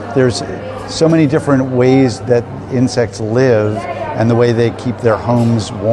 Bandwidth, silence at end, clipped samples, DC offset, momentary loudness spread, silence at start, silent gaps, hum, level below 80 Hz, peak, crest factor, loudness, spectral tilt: 11 kHz; 0 s; under 0.1%; under 0.1%; 9 LU; 0 s; none; none; -44 dBFS; 0 dBFS; 12 dB; -14 LUFS; -7 dB/octave